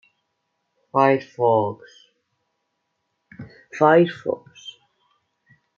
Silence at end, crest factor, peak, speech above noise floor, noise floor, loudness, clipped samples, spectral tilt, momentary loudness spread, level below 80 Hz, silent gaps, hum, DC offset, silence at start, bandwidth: 1.05 s; 20 dB; -4 dBFS; 56 dB; -75 dBFS; -20 LUFS; under 0.1%; -7.5 dB/octave; 25 LU; -74 dBFS; none; none; under 0.1%; 0.95 s; 7.2 kHz